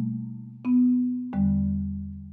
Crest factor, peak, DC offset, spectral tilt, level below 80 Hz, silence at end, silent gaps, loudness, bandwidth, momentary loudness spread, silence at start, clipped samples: 10 dB; -14 dBFS; under 0.1%; -12 dB/octave; -44 dBFS; 0 s; none; -26 LUFS; 2.9 kHz; 13 LU; 0 s; under 0.1%